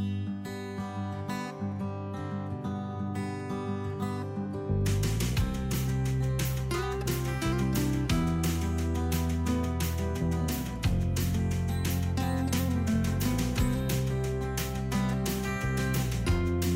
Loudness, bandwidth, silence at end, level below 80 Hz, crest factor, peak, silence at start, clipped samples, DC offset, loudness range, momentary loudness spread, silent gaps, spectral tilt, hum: -31 LUFS; 16 kHz; 0 s; -38 dBFS; 12 dB; -18 dBFS; 0 s; under 0.1%; under 0.1%; 5 LU; 7 LU; none; -6 dB/octave; none